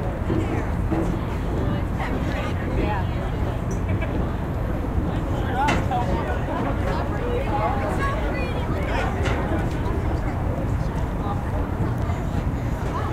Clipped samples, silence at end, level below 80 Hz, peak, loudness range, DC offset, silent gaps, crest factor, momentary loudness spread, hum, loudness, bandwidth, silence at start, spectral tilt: under 0.1%; 0 s; -28 dBFS; -8 dBFS; 2 LU; under 0.1%; none; 16 dB; 3 LU; none; -25 LUFS; 15 kHz; 0 s; -7.5 dB/octave